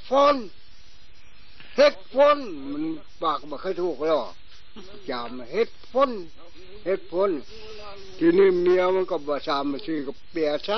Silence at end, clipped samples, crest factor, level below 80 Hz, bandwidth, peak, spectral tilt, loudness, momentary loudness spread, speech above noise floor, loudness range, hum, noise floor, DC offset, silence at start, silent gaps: 0 s; under 0.1%; 18 dB; -54 dBFS; 6.4 kHz; -6 dBFS; -3 dB/octave; -24 LUFS; 18 LU; 28 dB; 5 LU; none; -52 dBFS; 2%; 0.05 s; none